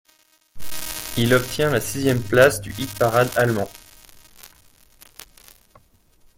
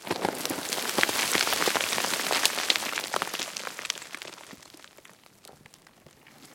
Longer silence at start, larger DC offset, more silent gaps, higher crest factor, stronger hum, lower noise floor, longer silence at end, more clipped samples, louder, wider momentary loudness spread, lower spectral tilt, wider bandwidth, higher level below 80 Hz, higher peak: first, 0.55 s vs 0 s; neither; neither; second, 22 dB vs 30 dB; neither; about the same, -59 dBFS vs -56 dBFS; first, 1.9 s vs 0 s; neither; first, -20 LUFS vs -27 LUFS; about the same, 17 LU vs 16 LU; first, -4.5 dB/octave vs -0.5 dB/octave; about the same, 17 kHz vs 17 kHz; first, -46 dBFS vs -70 dBFS; about the same, 0 dBFS vs 0 dBFS